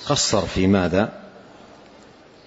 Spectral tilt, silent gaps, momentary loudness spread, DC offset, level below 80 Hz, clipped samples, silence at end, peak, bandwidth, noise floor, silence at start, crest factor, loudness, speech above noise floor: -4.5 dB/octave; none; 8 LU; under 0.1%; -44 dBFS; under 0.1%; 1.05 s; -4 dBFS; 8 kHz; -48 dBFS; 0 s; 18 dB; -20 LUFS; 28 dB